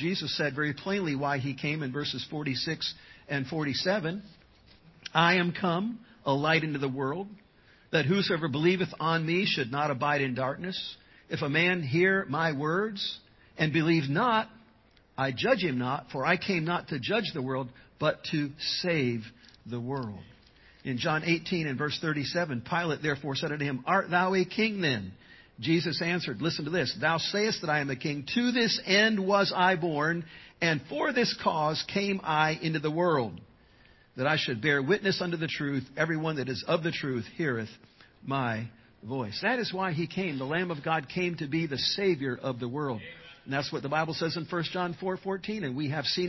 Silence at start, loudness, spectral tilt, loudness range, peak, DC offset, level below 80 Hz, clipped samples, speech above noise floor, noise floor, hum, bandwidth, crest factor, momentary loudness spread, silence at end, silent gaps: 0 s; -29 LUFS; -5.5 dB/octave; 6 LU; -6 dBFS; under 0.1%; -64 dBFS; under 0.1%; 32 dB; -61 dBFS; none; 6.2 kHz; 22 dB; 10 LU; 0 s; none